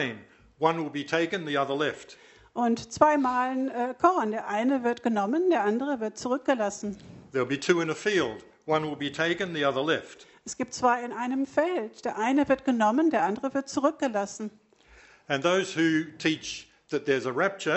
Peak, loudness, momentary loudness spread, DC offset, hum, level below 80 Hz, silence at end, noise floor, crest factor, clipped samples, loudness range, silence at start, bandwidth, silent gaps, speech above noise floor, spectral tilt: -6 dBFS; -27 LUFS; 10 LU; under 0.1%; none; -66 dBFS; 0 s; -56 dBFS; 22 dB; under 0.1%; 2 LU; 0 s; 8.2 kHz; none; 30 dB; -4.5 dB/octave